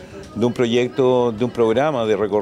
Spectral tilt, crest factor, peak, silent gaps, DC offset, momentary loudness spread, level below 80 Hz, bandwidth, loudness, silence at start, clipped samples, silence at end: -6.5 dB/octave; 12 dB; -6 dBFS; none; under 0.1%; 5 LU; -52 dBFS; 11 kHz; -19 LUFS; 0 s; under 0.1%; 0 s